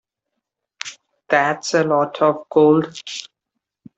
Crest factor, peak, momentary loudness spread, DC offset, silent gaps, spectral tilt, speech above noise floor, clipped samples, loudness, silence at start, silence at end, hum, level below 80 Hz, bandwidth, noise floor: 18 dB; -2 dBFS; 18 LU; under 0.1%; none; -5 dB/octave; 63 dB; under 0.1%; -17 LUFS; 0.85 s; 0.7 s; none; -68 dBFS; 8.2 kHz; -80 dBFS